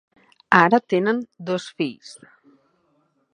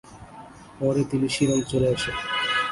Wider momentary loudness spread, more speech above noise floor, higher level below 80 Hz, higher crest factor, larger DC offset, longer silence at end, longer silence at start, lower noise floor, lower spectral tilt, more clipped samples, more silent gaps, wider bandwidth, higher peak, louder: second, 16 LU vs 21 LU; first, 45 dB vs 21 dB; second, -70 dBFS vs -50 dBFS; first, 22 dB vs 16 dB; neither; first, 1.2 s vs 0 s; first, 0.5 s vs 0.05 s; first, -66 dBFS vs -44 dBFS; first, -6 dB/octave vs -4.5 dB/octave; neither; neither; about the same, 10.5 kHz vs 11.5 kHz; first, 0 dBFS vs -8 dBFS; first, -20 LUFS vs -24 LUFS